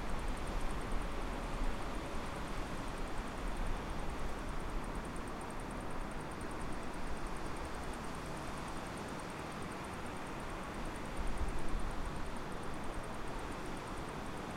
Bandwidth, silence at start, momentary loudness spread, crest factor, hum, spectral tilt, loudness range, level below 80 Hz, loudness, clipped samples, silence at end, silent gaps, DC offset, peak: 15.5 kHz; 0 s; 2 LU; 16 dB; none; -5 dB/octave; 1 LU; -44 dBFS; -43 LUFS; under 0.1%; 0 s; none; under 0.1%; -24 dBFS